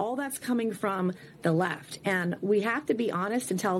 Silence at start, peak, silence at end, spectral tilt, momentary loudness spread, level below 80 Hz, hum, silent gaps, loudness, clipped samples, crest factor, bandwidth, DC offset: 0 s; -12 dBFS; 0 s; -5.5 dB/octave; 5 LU; -72 dBFS; none; none; -29 LUFS; under 0.1%; 16 dB; 16.5 kHz; under 0.1%